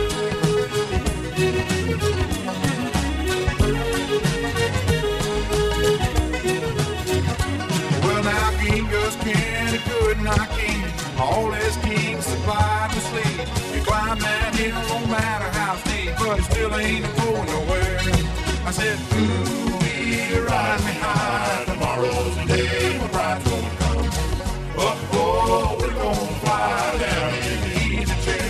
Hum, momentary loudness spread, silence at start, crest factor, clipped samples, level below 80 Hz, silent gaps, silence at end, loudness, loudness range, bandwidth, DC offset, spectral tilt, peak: none; 3 LU; 0 s; 18 dB; under 0.1%; -30 dBFS; none; 0 s; -22 LUFS; 1 LU; 15 kHz; under 0.1%; -5 dB/octave; -4 dBFS